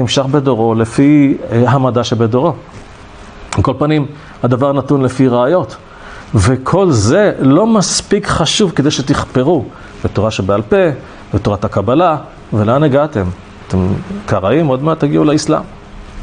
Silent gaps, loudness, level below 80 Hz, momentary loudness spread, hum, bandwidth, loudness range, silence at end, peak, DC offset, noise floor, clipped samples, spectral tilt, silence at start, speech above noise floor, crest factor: none; -13 LUFS; -36 dBFS; 10 LU; none; 10 kHz; 3 LU; 0 s; 0 dBFS; under 0.1%; -34 dBFS; under 0.1%; -6 dB/octave; 0 s; 22 dB; 12 dB